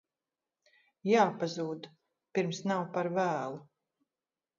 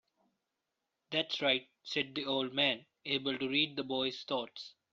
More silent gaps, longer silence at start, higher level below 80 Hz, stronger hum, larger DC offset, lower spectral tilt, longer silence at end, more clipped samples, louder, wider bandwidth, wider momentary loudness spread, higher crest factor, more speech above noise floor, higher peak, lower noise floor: neither; about the same, 1.05 s vs 1.1 s; about the same, -82 dBFS vs -78 dBFS; neither; neither; first, -5 dB/octave vs -1 dB/octave; first, 0.95 s vs 0.25 s; neither; about the same, -32 LUFS vs -34 LUFS; about the same, 7.4 kHz vs 7.6 kHz; first, 15 LU vs 7 LU; about the same, 22 dB vs 20 dB; first, over 59 dB vs 52 dB; first, -12 dBFS vs -16 dBFS; about the same, under -90 dBFS vs -87 dBFS